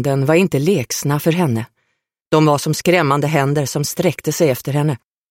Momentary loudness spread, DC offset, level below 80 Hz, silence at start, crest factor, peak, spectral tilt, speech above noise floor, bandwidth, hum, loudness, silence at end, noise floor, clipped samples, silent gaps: 6 LU; under 0.1%; -54 dBFS; 0 s; 14 dB; -2 dBFS; -5.5 dB/octave; 54 dB; 16.5 kHz; none; -17 LUFS; 0.35 s; -70 dBFS; under 0.1%; 2.22-2.31 s